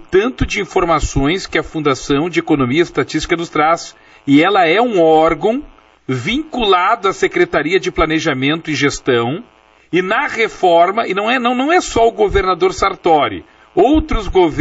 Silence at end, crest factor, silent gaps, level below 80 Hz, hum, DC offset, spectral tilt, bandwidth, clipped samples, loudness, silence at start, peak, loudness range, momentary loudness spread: 0 s; 14 dB; none; -32 dBFS; none; under 0.1%; -3.5 dB/octave; 8 kHz; under 0.1%; -14 LUFS; 0 s; -2 dBFS; 2 LU; 7 LU